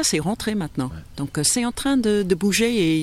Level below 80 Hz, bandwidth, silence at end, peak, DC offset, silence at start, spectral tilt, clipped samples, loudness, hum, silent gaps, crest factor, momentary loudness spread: -44 dBFS; 15.5 kHz; 0 s; -6 dBFS; under 0.1%; 0 s; -4 dB/octave; under 0.1%; -21 LUFS; none; none; 14 dB; 10 LU